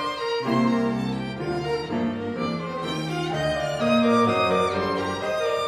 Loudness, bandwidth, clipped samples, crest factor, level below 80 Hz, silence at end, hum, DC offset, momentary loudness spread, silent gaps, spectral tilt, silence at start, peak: -24 LUFS; 13 kHz; under 0.1%; 16 dB; -52 dBFS; 0 s; none; under 0.1%; 8 LU; none; -6 dB/octave; 0 s; -8 dBFS